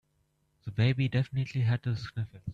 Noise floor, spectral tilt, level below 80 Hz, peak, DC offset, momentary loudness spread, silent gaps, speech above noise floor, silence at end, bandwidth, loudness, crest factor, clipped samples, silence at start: -74 dBFS; -8 dB/octave; -58 dBFS; -14 dBFS; under 0.1%; 11 LU; none; 44 dB; 0 s; 7.2 kHz; -31 LUFS; 16 dB; under 0.1%; 0.65 s